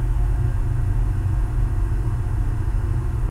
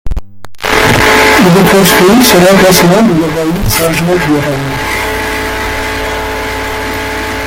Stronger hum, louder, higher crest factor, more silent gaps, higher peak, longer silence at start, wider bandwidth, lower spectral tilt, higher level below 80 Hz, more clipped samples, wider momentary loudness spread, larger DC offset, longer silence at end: neither; second, -24 LUFS vs -8 LUFS; about the same, 10 dB vs 8 dB; neither; second, -10 dBFS vs 0 dBFS; about the same, 0 s vs 0.05 s; second, 10.5 kHz vs over 20 kHz; first, -8.5 dB/octave vs -4 dB/octave; about the same, -22 dBFS vs -24 dBFS; second, under 0.1% vs 0.3%; second, 2 LU vs 11 LU; neither; about the same, 0 s vs 0 s